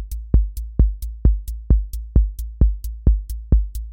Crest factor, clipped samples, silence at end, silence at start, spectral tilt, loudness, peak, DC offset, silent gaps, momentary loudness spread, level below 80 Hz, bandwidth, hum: 16 dB; under 0.1%; 0 s; 0 s; -9 dB/octave; -22 LUFS; -2 dBFS; under 0.1%; none; 3 LU; -20 dBFS; 16 kHz; none